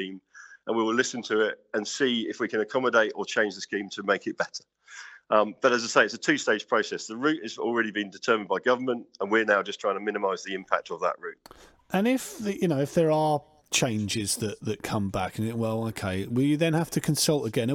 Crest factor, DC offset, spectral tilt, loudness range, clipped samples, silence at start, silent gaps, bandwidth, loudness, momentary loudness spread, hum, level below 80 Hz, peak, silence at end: 20 dB; under 0.1%; -4.5 dB/octave; 3 LU; under 0.1%; 0 s; none; 18 kHz; -27 LUFS; 9 LU; none; -62 dBFS; -6 dBFS; 0 s